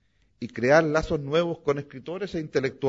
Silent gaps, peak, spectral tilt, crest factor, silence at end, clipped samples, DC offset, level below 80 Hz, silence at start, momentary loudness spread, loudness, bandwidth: none; -6 dBFS; -6 dB/octave; 20 dB; 0 s; under 0.1%; under 0.1%; -50 dBFS; 0.4 s; 15 LU; -25 LUFS; 7.8 kHz